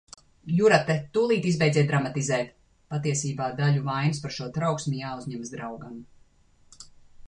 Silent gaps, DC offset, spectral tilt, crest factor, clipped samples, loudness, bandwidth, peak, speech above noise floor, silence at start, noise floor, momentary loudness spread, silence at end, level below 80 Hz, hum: none; under 0.1%; -5.5 dB/octave; 22 dB; under 0.1%; -26 LUFS; 10.5 kHz; -6 dBFS; 33 dB; 0.45 s; -59 dBFS; 15 LU; 0.05 s; -60 dBFS; none